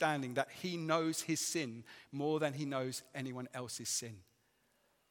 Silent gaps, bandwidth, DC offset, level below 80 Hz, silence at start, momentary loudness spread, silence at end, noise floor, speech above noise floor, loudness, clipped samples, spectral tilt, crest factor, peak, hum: none; 17.5 kHz; under 0.1%; -84 dBFS; 0 s; 10 LU; 0.9 s; -76 dBFS; 37 dB; -38 LUFS; under 0.1%; -3.5 dB/octave; 22 dB; -18 dBFS; none